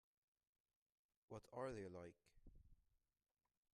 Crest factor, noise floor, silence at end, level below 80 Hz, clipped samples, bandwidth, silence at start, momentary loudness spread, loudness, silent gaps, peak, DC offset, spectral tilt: 22 dB; -84 dBFS; 0.9 s; -76 dBFS; under 0.1%; 10 kHz; 1.3 s; 10 LU; -55 LUFS; none; -36 dBFS; under 0.1%; -6.5 dB/octave